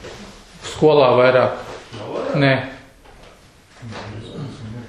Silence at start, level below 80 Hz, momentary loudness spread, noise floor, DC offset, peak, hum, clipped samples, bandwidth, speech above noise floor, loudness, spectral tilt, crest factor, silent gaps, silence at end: 0 s; -50 dBFS; 22 LU; -47 dBFS; under 0.1%; 0 dBFS; none; under 0.1%; 11.5 kHz; 33 dB; -16 LUFS; -6 dB/octave; 20 dB; none; 0 s